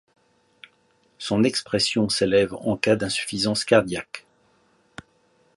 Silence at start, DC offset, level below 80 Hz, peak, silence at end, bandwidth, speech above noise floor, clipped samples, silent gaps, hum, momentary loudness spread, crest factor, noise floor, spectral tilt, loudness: 1.2 s; under 0.1%; -56 dBFS; -4 dBFS; 1.35 s; 11.5 kHz; 41 dB; under 0.1%; none; none; 12 LU; 20 dB; -63 dBFS; -4 dB/octave; -22 LUFS